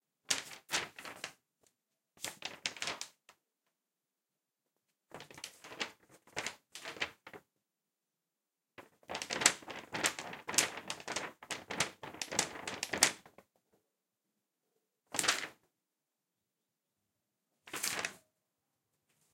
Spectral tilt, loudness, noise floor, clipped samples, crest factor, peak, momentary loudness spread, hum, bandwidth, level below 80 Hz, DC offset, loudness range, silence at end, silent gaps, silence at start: 0 dB/octave; -36 LUFS; under -90 dBFS; under 0.1%; 36 dB; -6 dBFS; 18 LU; none; 17 kHz; -78 dBFS; under 0.1%; 11 LU; 1.15 s; none; 0.3 s